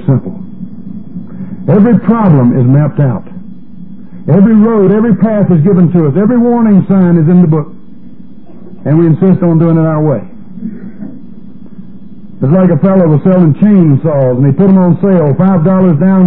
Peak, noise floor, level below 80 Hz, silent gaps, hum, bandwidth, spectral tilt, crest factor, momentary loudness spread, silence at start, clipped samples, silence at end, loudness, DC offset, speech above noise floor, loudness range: 0 dBFS; -34 dBFS; -44 dBFS; none; none; 3.3 kHz; -14 dB/octave; 8 dB; 19 LU; 0 s; 1%; 0 s; -8 LUFS; 5%; 27 dB; 5 LU